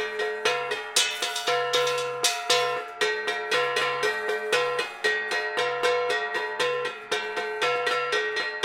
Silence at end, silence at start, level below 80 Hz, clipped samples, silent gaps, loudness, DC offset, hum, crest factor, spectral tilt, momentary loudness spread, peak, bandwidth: 0 s; 0 s; -74 dBFS; under 0.1%; none; -25 LUFS; under 0.1%; none; 20 dB; 0 dB/octave; 5 LU; -6 dBFS; 17 kHz